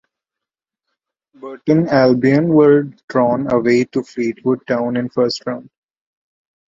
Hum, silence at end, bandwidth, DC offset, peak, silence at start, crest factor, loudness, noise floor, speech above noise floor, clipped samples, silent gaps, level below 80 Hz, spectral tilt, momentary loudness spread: none; 1.05 s; 7.6 kHz; under 0.1%; -2 dBFS; 1.45 s; 16 dB; -16 LUFS; -85 dBFS; 70 dB; under 0.1%; 3.04-3.08 s; -58 dBFS; -7.5 dB/octave; 13 LU